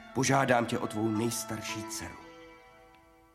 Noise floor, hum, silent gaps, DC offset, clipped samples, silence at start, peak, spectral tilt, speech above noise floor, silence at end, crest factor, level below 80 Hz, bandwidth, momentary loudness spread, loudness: -59 dBFS; none; none; under 0.1%; under 0.1%; 0 s; -12 dBFS; -4.5 dB/octave; 29 dB; 0.75 s; 22 dB; -62 dBFS; 16.5 kHz; 21 LU; -30 LUFS